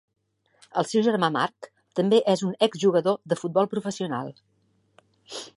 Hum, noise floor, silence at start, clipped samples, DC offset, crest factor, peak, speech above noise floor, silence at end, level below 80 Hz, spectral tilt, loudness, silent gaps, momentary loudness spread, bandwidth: none; -67 dBFS; 0.75 s; under 0.1%; under 0.1%; 20 dB; -6 dBFS; 43 dB; 0.1 s; -74 dBFS; -5.5 dB/octave; -24 LUFS; none; 12 LU; 11.5 kHz